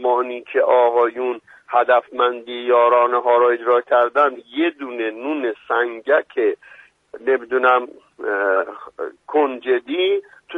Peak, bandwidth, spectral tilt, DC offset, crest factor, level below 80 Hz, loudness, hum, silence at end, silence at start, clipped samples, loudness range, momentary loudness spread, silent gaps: -2 dBFS; 4 kHz; -5 dB/octave; under 0.1%; 16 dB; -72 dBFS; -19 LUFS; none; 0 s; 0 s; under 0.1%; 4 LU; 11 LU; none